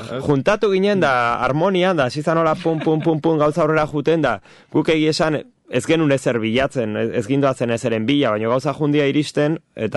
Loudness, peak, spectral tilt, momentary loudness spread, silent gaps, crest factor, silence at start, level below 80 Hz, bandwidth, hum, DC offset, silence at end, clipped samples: -18 LUFS; -6 dBFS; -6 dB/octave; 5 LU; none; 12 dB; 0 s; -50 dBFS; 11.5 kHz; none; under 0.1%; 0 s; under 0.1%